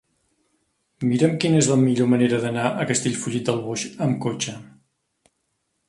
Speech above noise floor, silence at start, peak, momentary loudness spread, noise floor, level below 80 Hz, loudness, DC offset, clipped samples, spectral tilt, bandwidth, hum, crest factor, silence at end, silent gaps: 53 dB; 1 s; -4 dBFS; 9 LU; -74 dBFS; -62 dBFS; -22 LUFS; under 0.1%; under 0.1%; -5 dB/octave; 11.5 kHz; none; 20 dB; 1.25 s; none